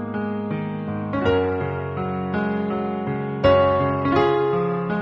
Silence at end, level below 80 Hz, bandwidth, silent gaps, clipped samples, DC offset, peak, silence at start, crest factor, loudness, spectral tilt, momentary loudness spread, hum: 0 s; -48 dBFS; 6.4 kHz; none; under 0.1%; under 0.1%; -4 dBFS; 0 s; 18 dB; -22 LUFS; -9 dB/octave; 9 LU; none